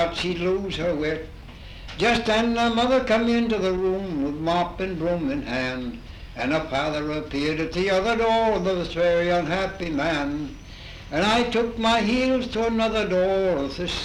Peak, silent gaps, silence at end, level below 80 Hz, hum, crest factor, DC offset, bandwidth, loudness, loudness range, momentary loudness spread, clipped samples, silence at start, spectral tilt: -8 dBFS; none; 0 s; -42 dBFS; none; 16 dB; under 0.1%; 12 kHz; -23 LUFS; 4 LU; 12 LU; under 0.1%; 0 s; -5.5 dB/octave